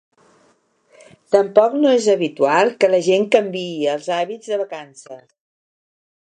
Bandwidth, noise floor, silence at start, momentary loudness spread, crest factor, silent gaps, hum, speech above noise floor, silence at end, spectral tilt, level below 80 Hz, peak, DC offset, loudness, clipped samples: 10 kHz; -59 dBFS; 1.3 s; 11 LU; 18 dB; none; none; 42 dB; 1.25 s; -4.5 dB/octave; -72 dBFS; -2 dBFS; under 0.1%; -17 LUFS; under 0.1%